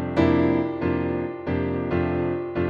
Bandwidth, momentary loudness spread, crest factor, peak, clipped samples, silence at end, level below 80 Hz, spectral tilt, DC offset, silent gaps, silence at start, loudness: 7 kHz; 7 LU; 18 dB; -6 dBFS; under 0.1%; 0 s; -44 dBFS; -9.5 dB/octave; under 0.1%; none; 0 s; -24 LUFS